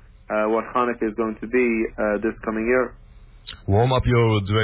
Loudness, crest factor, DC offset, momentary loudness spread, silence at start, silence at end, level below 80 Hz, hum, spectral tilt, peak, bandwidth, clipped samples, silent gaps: -22 LUFS; 14 dB; under 0.1%; 9 LU; 0.3 s; 0 s; -40 dBFS; none; -11 dB/octave; -8 dBFS; 4 kHz; under 0.1%; none